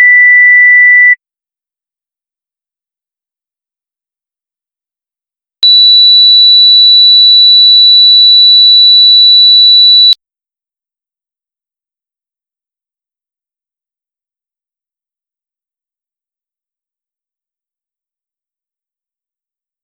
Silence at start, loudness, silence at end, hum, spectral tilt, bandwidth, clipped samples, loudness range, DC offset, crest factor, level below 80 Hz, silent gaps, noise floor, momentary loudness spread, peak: 0 s; 0 LUFS; 9.7 s; none; 5 dB/octave; 6 kHz; 0.3%; 10 LU; under 0.1%; 8 dB; -78 dBFS; none; -87 dBFS; 3 LU; 0 dBFS